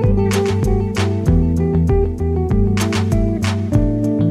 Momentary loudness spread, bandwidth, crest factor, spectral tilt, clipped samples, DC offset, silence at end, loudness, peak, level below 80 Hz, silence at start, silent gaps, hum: 3 LU; 14 kHz; 14 dB; -7 dB/octave; under 0.1%; under 0.1%; 0 s; -17 LUFS; -2 dBFS; -22 dBFS; 0 s; none; none